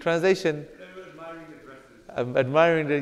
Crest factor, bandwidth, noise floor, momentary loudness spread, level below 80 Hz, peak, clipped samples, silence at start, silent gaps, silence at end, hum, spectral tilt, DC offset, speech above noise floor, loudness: 20 dB; 13 kHz; -48 dBFS; 23 LU; -62 dBFS; -4 dBFS; under 0.1%; 0 s; none; 0 s; none; -6 dB/octave; under 0.1%; 26 dB; -23 LUFS